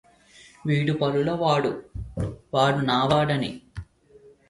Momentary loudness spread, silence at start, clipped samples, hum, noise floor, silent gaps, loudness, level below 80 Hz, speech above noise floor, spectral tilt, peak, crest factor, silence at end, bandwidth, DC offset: 15 LU; 0.65 s; under 0.1%; none; -53 dBFS; none; -24 LUFS; -46 dBFS; 30 dB; -6.5 dB/octave; -6 dBFS; 18 dB; 0.65 s; 11.5 kHz; under 0.1%